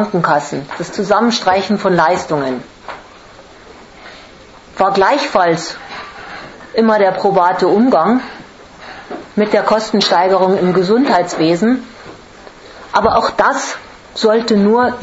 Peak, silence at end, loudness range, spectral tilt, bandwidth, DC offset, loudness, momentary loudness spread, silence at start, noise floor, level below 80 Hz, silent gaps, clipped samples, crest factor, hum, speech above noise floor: 0 dBFS; 0 s; 4 LU; -5 dB/octave; 8 kHz; under 0.1%; -13 LUFS; 20 LU; 0 s; -39 dBFS; -48 dBFS; none; under 0.1%; 14 dB; none; 26 dB